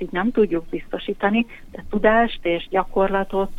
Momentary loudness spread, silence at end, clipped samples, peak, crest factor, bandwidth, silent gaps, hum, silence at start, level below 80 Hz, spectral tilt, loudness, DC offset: 11 LU; 0 s; under 0.1%; -4 dBFS; 18 dB; 6.2 kHz; none; none; 0 s; -38 dBFS; -7.5 dB/octave; -21 LUFS; under 0.1%